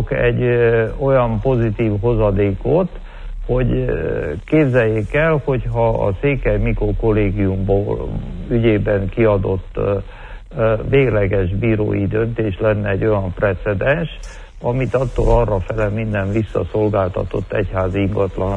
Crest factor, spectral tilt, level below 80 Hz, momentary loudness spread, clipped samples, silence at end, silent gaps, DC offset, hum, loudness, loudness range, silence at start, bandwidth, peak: 14 dB; -9 dB/octave; -28 dBFS; 7 LU; under 0.1%; 0 s; none; under 0.1%; none; -18 LUFS; 2 LU; 0 s; 8 kHz; -2 dBFS